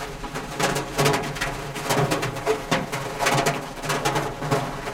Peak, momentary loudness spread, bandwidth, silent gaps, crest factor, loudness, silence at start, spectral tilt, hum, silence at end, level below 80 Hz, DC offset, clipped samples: -6 dBFS; 8 LU; 17 kHz; none; 20 dB; -24 LUFS; 0 s; -4 dB/octave; none; 0 s; -42 dBFS; under 0.1%; under 0.1%